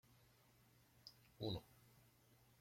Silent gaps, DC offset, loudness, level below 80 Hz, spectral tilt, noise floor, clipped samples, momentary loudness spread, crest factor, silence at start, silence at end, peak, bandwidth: none; under 0.1%; -50 LUFS; -76 dBFS; -6.5 dB/octave; -73 dBFS; under 0.1%; 16 LU; 24 dB; 0.1 s; 0.6 s; -32 dBFS; 16.5 kHz